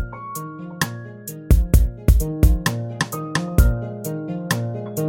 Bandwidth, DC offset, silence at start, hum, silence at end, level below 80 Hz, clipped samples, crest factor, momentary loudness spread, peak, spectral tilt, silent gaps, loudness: 17 kHz; under 0.1%; 0 s; none; 0 s; -22 dBFS; under 0.1%; 18 dB; 13 LU; -2 dBFS; -5.5 dB/octave; none; -22 LUFS